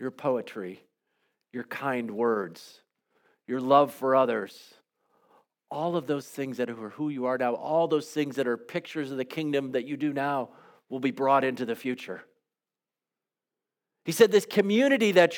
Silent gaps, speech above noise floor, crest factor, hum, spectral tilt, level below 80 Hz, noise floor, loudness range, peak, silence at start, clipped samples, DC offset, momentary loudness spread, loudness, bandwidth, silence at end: none; over 63 dB; 24 dB; none; -5 dB/octave; -86 dBFS; under -90 dBFS; 5 LU; -4 dBFS; 0 s; under 0.1%; under 0.1%; 17 LU; -27 LUFS; 19 kHz; 0 s